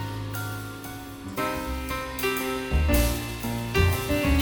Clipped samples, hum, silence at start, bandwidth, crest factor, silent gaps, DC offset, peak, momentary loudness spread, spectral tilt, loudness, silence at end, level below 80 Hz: under 0.1%; none; 0 s; 19 kHz; 18 dB; none; under 0.1%; -8 dBFS; 12 LU; -5 dB/octave; -27 LUFS; 0 s; -32 dBFS